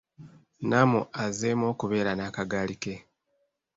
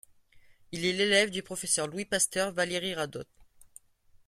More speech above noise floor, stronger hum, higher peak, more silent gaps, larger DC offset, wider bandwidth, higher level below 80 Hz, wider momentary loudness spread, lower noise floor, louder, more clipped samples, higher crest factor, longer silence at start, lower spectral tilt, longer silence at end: first, 48 dB vs 32 dB; neither; about the same, -8 dBFS vs -10 dBFS; neither; neither; second, 8 kHz vs 16 kHz; first, -60 dBFS vs -66 dBFS; about the same, 13 LU vs 12 LU; first, -75 dBFS vs -62 dBFS; about the same, -28 LUFS vs -28 LUFS; neither; about the same, 20 dB vs 22 dB; second, 0.2 s vs 0.35 s; first, -5.5 dB/octave vs -2 dB/octave; first, 0.75 s vs 0.6 s